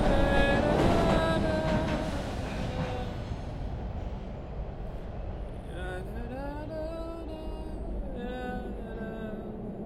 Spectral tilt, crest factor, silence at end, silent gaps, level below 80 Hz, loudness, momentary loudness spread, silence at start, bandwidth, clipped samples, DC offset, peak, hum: -6.5 dB/octave; 20 dB; 0 s; none; -36 dBFS; -32 LUFS; 15 LU; 0 s; 13 kHz; under 0.1%; under 0.1%; -12 dBFS; none